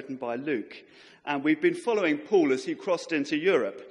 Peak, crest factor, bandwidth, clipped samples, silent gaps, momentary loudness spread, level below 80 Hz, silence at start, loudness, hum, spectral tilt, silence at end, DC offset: -10 dBFS; 16 dB; 11.5 kHz; under 0.1%; none; 9 LU; -78 dBFS; 0 s; -27 LUFS; none; -5 dB/octave; 0 s; under 0.1%